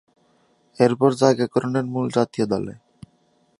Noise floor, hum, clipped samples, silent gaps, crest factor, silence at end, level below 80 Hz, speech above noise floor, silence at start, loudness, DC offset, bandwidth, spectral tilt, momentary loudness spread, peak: -62 dBFS; none; under 0.1%; none; 22 dB; 0.9 s; -60 dBFS; 42 dB; 0.8 s; -21 LUFS; under 0.1%; 11.5 kHz; -6.5 dB/octave; 7 LU; -2 dBFS